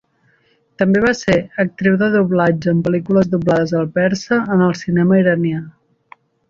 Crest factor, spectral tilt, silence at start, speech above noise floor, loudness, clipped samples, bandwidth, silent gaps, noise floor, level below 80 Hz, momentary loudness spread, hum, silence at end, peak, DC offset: 16 dB; -7.5 dB/octave; 0.8 s; 43 dB; -16 LUFS; under 0.1%; 7.4 kHz; none; -58 dBFS; -50 dBFS; 4 LU; none; 0.8 s; -2 dBFS; under 0.1%